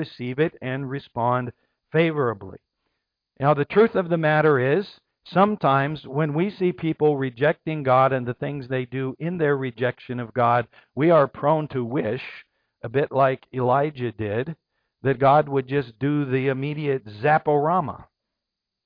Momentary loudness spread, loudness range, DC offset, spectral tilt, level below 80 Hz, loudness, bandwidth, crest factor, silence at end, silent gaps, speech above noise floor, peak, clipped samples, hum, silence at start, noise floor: 11 LU; 3 LU; under 0.1%; -10 dB/octave; -62 dBFS; -23 LUFS; 5.2 kHz; 16 dB; 0.85 s; none; 62 dB; -6 dBFS; under 0.1%; none; 0 s; -84 dBFS